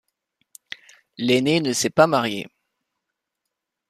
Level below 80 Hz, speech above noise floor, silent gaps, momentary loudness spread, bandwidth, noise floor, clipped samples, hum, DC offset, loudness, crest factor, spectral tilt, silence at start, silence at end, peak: -66 dBFS; 62 dB; none; 21 LU; 15 kHz; -82 dBFS; under 0.1%; none; under 0.1%; -20 LUFS; 22 dB; -4 dB/octave; 1.2 s; 1.45 s; -2 dBFS